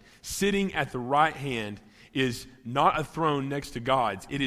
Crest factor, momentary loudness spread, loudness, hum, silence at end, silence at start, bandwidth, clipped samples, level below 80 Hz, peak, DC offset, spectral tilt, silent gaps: 20 dB; 11 LU; -28 LUFS; none; 0 s; 0.25 s; 16 kHz; under 0.1%; -54 dBFS; -8 dBFS; under 0.1%; -4.5 dB/octave; none